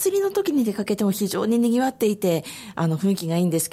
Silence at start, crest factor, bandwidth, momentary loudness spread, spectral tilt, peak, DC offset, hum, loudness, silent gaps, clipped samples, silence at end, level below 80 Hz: 0 s; 12 dB; 16 kHz; 4 LU; -5.5 dB/octave; -10 dBFS; under 0.1%; none; -22 LUFS; none; under 0.1%; 0.05 s; -64 dBFS